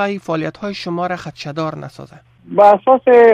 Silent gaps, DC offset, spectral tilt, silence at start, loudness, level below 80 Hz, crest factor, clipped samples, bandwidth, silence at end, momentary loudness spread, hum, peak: none; under 0.1%; -6.5 dB/octave; 0 s; -15 LUFS; -56 dBFS; 14 dB; under 0.1%; 8.2 kHz; 0 s; 16 LU; none; 0 dBFS